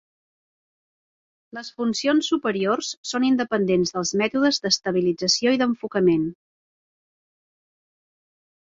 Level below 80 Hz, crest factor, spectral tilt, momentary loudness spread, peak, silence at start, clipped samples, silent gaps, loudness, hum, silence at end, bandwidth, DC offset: -64 dBFS; 18 dB; -4 dB/octave; 8 LU; -6 dBFS; 1.55 s; under 0.1%; 2.97-3.03 s; -22 LUFS; none; 2.3 s; 7.8 kHz; under 0.1%